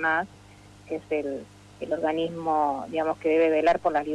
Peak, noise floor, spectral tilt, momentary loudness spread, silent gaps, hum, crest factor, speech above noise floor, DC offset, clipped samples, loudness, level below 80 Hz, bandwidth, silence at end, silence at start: -12 dBFS; -50 dBFS; -6 dB/octave; 14 LU; none; 50 Hz at -55 dBFS; 14 dB; 24 dB; under 0.1%; under 0.1%; -26 LUFS; -60 dBFS; 10.5 kHz; 0 s; 0 s